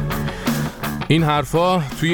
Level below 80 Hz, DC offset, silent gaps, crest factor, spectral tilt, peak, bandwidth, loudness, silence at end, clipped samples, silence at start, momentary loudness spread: -36 dBFS; under 0.1%; none; 16 dB; -6 dB/octave; -2 dBFS; over 20 kHz; -20 LUFS; 0 s; under 0.1%; 0 s; 8 LU